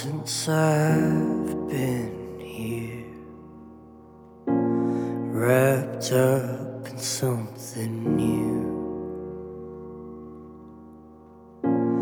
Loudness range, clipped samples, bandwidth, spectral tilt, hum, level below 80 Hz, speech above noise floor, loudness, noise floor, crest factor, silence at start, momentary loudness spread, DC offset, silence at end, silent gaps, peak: 7 LU; under 0.1%; 20 kHz; -6 dB/octave; none; -56 dBFS; 24 dB; -26 LUFS; -48 dBFS; 18 dB; 0 s; 22 LU; under 0.1%; 0 s; none; -8 dBFS